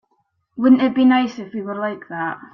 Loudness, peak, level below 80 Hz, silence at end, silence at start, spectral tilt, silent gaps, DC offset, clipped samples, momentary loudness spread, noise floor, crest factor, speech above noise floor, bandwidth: -18 LUFS; -2 dBFS; -62 dBFS; 0.1 s; 0.55 s; -6.5 dB/octave; none; under 0.1%; under 0.1%; 14 LU; -68 dBFS; 16 dB; 50 dB; 6.2 kHz